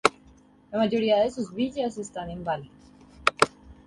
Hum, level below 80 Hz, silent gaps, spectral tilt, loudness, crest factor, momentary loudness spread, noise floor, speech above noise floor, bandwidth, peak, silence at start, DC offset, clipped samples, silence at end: none; -56 dBFS; none; -4 dB/octave; -27 LUFS; 26 dB; 11 LU; -55 dBFS; 29 dB; 11.5 kHz; 0 dBFS; 0.05 s; under 0.1%; under 0.1%; 0.15 s